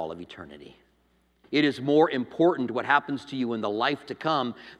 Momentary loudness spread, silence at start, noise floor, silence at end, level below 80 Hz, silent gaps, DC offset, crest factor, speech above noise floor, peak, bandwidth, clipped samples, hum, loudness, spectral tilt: 15 LU; 0 s; -67 dBFS; 0.05 s; -68 dBFS; none; under 0.1%; 20 dB; 40 dB; -6 dBFS; 10 kHz; under 0.1%; none; -26 LUFS; -6.5 dB/octave